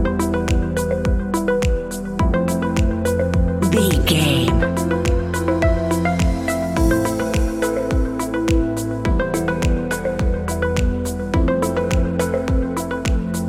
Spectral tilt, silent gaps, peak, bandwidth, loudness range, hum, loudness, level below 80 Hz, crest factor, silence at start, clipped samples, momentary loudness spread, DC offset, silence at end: -6 dB/octave; none; -2 dBFS; 16 kHz; 3 LU; none; -20 LUFS; -24 dBFS; 16 dB; 0 s; under 0.1%; 5 LU; under 0.1%; 0 s